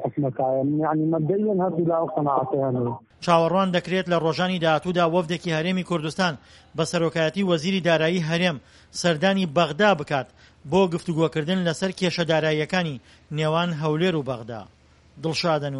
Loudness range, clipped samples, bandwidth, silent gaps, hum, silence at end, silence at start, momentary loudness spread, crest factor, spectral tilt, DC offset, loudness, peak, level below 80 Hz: 2 LU; under 0.1%; 11.5 kHz; none; none; 0 s; 0 s; 8 LU; 18 dB; -6 dB/octave; under 0.1%; -23 LUFS; -4 dBFS; -58 dBFS